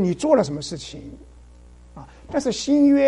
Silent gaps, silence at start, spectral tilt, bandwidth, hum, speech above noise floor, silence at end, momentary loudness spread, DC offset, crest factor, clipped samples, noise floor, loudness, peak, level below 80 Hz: none; 0 s; -5.5 dB/octave; 10.5 kHz; none; 26 dB; 0 s; 25 LU; under 0.1%; 18 dB; under 0.1%; -46 dBFS; -21 LUFS; -4 dBFS; -48 dBFS